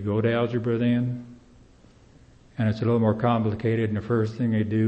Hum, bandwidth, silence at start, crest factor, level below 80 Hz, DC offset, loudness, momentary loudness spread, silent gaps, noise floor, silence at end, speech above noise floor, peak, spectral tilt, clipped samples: none; 6.2 kHz; 0 s; 16 dB; -56 dBFS; under 0.1%; -24 LUFS; 5 LU; none; -53 dBFS; 0 s; 30 dB; -8 dBFS; -9.5 dB/octave; under 0.1%